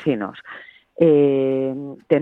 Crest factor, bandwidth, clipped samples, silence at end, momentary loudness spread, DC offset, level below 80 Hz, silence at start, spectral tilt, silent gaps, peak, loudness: 16 dB; 4.1 kHz; under 0.1%; 0 s; 22 LU; under 0.1%; -62 dBFS; 0 s; -9.5 dB/octave; none; -4 dBFS; -19 LUFS